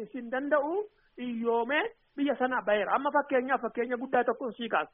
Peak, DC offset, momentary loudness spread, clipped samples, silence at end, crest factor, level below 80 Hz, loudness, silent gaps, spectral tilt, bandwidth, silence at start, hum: -14 dBFS; under 0.1%; 8 LU; under 0.1%; 0.05 s; 16 dB; -72 dBFS; -30 LUFS; none; -2 dB/octave; 3.8 kHz; 0 s; none